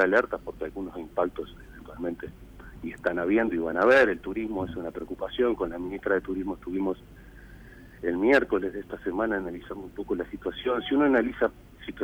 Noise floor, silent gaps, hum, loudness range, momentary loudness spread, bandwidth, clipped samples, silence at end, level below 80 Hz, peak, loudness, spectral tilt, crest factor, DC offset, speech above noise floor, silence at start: -48 dBFS; none; none; 5 LU; 17 LU; 19.5 kHz; under 0.1%; 0 s; -50 dBFS; -10 dBFS; -27 LUFS; -6.5 dB/octave; 18 dB; under 0.1%; 20 dB; 0 s